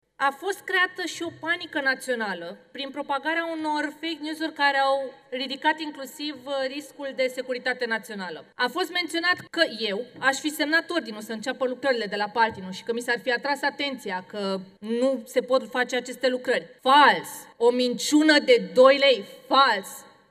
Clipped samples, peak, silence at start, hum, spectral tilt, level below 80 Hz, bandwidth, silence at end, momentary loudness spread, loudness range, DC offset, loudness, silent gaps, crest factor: under 0.1%; -4 dBFS; 0.2 s; none; -3 dB/octave; -80 dBFS; 15 kHz; 0.25 s; 14 LU; 8 LU; under 0.1%; -24 LUFS; none; 22 dB